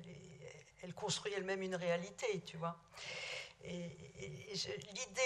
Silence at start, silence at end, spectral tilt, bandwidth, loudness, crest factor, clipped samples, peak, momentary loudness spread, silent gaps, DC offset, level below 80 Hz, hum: 0 s; 0 s; -3.5 dB/octave; 12.5 kHz; -43 LUFS; 22 dB; under 0.1%; -22 dBFS; 15 LU; none; under 0.1%; -76 dBFS; none